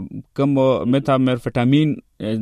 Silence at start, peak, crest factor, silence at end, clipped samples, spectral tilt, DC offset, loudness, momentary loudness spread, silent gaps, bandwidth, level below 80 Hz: 0 s; -4 dBFS; 14 dB; 0 s; under 0.1%; -8.5 dB/octave; under 0.1%; -18 LUFS; 9 LU; none; 11 kHz; -50 dBFS